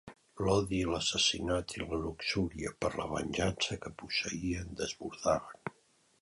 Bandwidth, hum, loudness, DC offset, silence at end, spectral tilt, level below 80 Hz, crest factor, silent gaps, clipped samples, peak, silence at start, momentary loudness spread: 11.5 kHz; none; -34 LUFS; under 0.1%; 0.5 s; -4 dB/octave; -52 dBFS; 20 dB; none; under 0.1%; -14 dBFS; 0.05 s; 9 LU